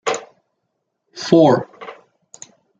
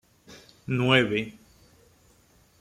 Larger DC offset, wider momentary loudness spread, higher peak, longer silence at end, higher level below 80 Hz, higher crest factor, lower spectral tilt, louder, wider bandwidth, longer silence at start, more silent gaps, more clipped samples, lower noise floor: neither; first, 24 LU vs 19 LU; first, -2 dBFS vs -6 dBFS; second, 0.9 s vs 1.3 s; about the same, -64 dBFS vs -62 dBFS; second, 18 dB vs 24 dB; about the same, -5.5 dB/octave vs -6 dB/octave; first, -16 LUFS vs -24 LUFS; second, 9.4 kHz vs 14 kHz; second, 0.05 s vs 0.3 s; neither; neither; first, -74 dBFS vs -60 dBFS